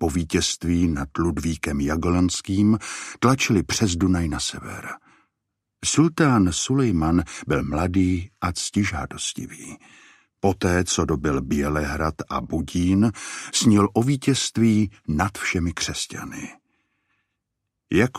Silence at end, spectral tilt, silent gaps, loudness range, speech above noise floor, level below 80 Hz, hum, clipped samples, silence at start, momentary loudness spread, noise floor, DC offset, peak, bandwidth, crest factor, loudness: 0 s; -5 dB/octave; none; 4 LU; 58 dB; -40 dBFS; none; under 0.1%; 0 s; 11 LU; -80 dBFS; under 0.1%; -4 dBFS; 15 kHz; 18 dB; -22 LUFS